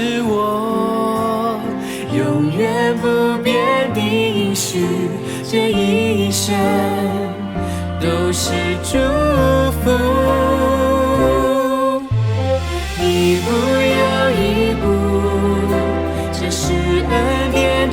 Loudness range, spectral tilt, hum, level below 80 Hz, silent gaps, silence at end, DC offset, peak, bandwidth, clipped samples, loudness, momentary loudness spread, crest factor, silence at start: 2 LU; -5.5 dB/octave; none; -32 dBFS; none; 0 s; under 0.1%; -2 dBFS; 18.5 kHz; under 0.1%; -17 LUFS; 6 LU; 14 dB; 0 s